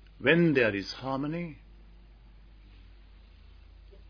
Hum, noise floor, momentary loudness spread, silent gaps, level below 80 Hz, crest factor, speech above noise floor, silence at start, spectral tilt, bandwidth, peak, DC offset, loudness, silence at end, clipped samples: none; -53 dBFS; 14 LU; none; -54 dBFS; 24 dB; 26 dB; 0.2 s; -7 dB/octave; 5.4 kHz; -8 dBFS; under 0.1%; -27 LUFS; 2.55 s; under 0.1%